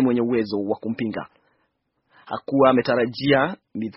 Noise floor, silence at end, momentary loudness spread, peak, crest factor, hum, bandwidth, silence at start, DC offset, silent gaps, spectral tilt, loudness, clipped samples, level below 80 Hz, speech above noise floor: -71 dBFS; 0.05 s; 16 LU; -2 dBFS; 20 dB; none; 5.8 kHz; 0 s; under 0.1%; none; -4.5 dB/octave; -21 LUFS; under 0.1%; -60 dBFS; 50 dB